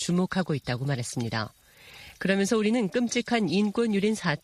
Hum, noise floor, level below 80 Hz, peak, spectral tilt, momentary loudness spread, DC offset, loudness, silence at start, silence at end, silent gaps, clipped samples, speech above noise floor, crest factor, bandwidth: none; -50 dBFS; -60 dBFS; -10 dBFS; -5 dB/octave; 8 LU; under 0.1%; -27 LUFS; 0 s; 0.05 s; none; under 0.1%; 24 dB; 16 dB; 14 kHz